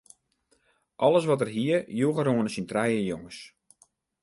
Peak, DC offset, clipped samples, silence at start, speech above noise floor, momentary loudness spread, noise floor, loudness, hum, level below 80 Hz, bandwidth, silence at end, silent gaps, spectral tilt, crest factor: -8 dBFS; under 0.1%; under 0.1%; 1 s; 44 dB; 12 LU; -70 dBFS; -26 LUFS; none; -66 dBFS; 11.5 kHz; 0.75 s; none; -6.5 dB/octave; 18 dB